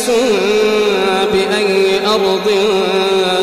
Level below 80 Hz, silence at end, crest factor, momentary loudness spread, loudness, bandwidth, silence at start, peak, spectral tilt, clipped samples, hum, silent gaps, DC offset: -48 dBFS; 0 s; 8 dB; 1 LU; -13 LUFS; 15 kHz; 0 s; -4 dBFS; -3.5 dB/octave; under 0.1%; none; none; under 0.1%